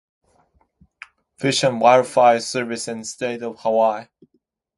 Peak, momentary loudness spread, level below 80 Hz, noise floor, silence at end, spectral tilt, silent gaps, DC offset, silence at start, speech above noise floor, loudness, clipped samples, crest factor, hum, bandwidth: 0 dBFS; 12 LU; -66 dBFS; -69 dBFS; 0.75 s; -4 dB/octave; none; under 0.1%; 1.4 s; 50 dB; -19 LUFS; under 0.1%; 20 dB; none; 11.5 kHz